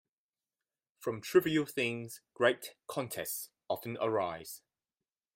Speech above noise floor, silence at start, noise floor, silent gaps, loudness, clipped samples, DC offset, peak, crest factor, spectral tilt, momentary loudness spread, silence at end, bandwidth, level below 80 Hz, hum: over 56 dB; 1 s; under -90 dBFS; none; -34 LUFS; under 0.1%; under 0.1%; -14 dBFS; 22 dB; -4.5 dB/octave; 14 LU; 0.75 s; 16.5 kHz; -76 dBFS; none